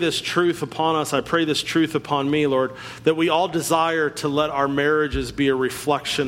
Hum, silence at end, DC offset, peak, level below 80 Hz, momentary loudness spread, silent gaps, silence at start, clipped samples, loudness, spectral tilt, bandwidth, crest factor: none; 0 s; under 0.1%; -6 dBFS; -44 dBFS; 3 LU; none; 0 s; under 0.1%; -21 LUFS; -4.5 dB/octave; 16.5 kHz; 16 dB